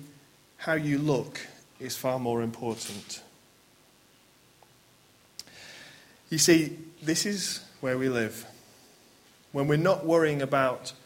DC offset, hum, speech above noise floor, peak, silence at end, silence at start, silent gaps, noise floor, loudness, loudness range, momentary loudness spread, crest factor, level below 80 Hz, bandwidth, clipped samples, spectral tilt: under 0.1%; none; 33 dB; -8 dBFS; 0.1 s; 0 s; none; -60 dBFS; -28 LUFS; 13 LU; 22 LU; 22 dB; -68 dBFS; 16.5 kHz; under 0.1%; -4 dB/octave